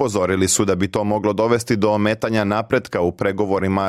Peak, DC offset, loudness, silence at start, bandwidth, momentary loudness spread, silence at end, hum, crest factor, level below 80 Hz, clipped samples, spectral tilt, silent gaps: -4 dBFS; under 0.1%; -19 LUFS; 0 s; 16 kHz; 4 LU; 0 s; none; 14 dB; -52 dBFS; under 0.1%; -5 dB/octave; none